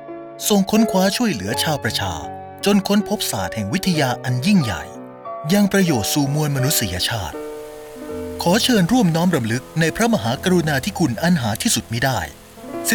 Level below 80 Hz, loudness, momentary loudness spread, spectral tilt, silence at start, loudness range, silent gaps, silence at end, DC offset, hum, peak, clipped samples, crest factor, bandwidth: -48 dBFS; -19 LUFS; 15 LU; -4.5 dB/octave; 0 s; 2 LU; none; 0 s; under 0.1%; none; -6 dBFS; under 0.1%; 14 dB; over 20 kHz